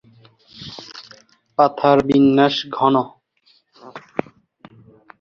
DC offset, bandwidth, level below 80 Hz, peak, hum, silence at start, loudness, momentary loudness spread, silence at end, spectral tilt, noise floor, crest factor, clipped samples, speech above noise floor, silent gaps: under 0.1%; 6.8 kHz; -58 dBFS; 0 dBFS; none; 0.6 s; -17 LUFS; 23 LU; 1.2 s; -7 dB/octave; -59 dBFS; 20 dB; under 0.1%; 44 dB; none